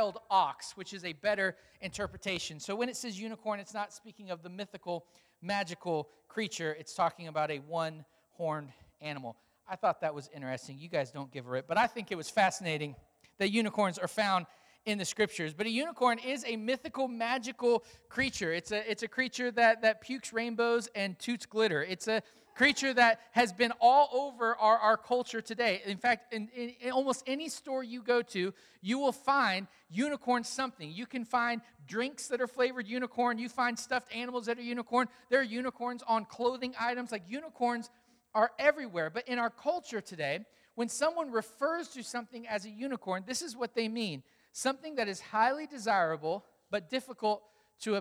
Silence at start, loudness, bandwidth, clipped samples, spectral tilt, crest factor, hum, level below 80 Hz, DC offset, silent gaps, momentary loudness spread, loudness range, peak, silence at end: 0 s; -33 LUFS; 16.5 kHz; under 0.1%; -3.5 dB/octave; 22 dB; none; -72 dBFS; under 0.1%; none; 13 LU; 9 LU; -12 dBFS; 0 s